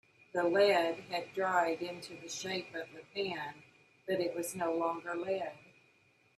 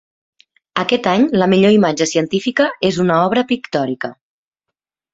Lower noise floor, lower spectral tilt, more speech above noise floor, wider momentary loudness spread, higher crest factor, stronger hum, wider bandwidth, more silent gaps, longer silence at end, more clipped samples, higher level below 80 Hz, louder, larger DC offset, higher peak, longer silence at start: second, -69 dBFS vs -81 dBFS; second, -3.5 dB/octave vs -5 dB/octave; second, 34 dB vs 66 dB; first, 15 LU vs 9 LU; about the same, 18 dB vs 16 dB; neither; first, 14 kHz vs 8 kHz; neither; second, 0.8 s vs 1 s; neither; second, -80 dBFS vs -56 dBFS; second, -35 LUFS vs -15 LUFS; neither; second, -16 dBFS vs 0 dBFS; second, 0.35 s vs 0.75 s